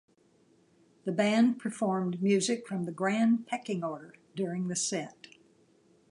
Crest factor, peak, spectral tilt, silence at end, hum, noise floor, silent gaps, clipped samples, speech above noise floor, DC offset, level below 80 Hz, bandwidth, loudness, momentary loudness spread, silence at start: 18 dB; -12 dBFS; -5 dB/octave; 1 s; none; -66 dBFS; none; under 0.1%; 36 dB; under 0.1%; -80 dBFS; 11.5 kHz; -30 LUFS; 12 LU; 1.05 s